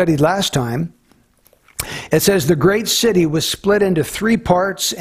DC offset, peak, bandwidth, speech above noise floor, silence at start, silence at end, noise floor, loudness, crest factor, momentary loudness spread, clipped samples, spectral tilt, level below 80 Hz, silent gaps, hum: under 0.1%; -2 dBFS; 16 kHz; 39 dB; 0 s; 0 s; -55 dBFS; -16 LUFS; 16 dB; 11 LU; under 0.1%; -4.5 dB/octave; -44 dBFS; none; none